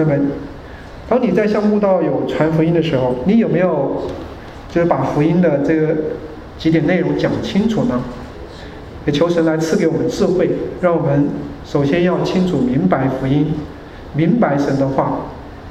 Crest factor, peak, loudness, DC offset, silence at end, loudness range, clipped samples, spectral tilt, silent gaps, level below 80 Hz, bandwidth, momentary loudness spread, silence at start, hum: 16 dB; 0 dBFS; -16 LUFS; under 0.1%; 0 s; 2 LU; under 0.1%; -7.5 dB/octave; none; -40 dBFS; 12.5 kHz; 17 LU; 0 s; none